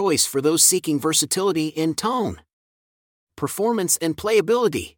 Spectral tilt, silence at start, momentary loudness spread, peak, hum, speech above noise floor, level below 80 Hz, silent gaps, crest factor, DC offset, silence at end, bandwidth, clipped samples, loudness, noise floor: -3 dB/octave; 0 s; 9 LU; -2 dBFS; none; over 69 dB; -58 dBFS; 2.53-3.27 s; 18 dB; under 0.1%; 0.1 s; 19 kHz; under 0.1%; -20 LUFS; under -90 dBFS